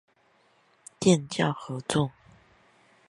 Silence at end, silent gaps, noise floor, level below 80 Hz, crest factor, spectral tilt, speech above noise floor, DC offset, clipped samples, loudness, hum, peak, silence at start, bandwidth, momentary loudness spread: 1 s; none; -65 dBFS; -64 dBFS; 22 dB; -5 dB/octave; 40 dB; under 0.1%; under 0.1%; -27 LUFS; none; -8 dBFS; 1 s; 11.5 kHz; 9 LU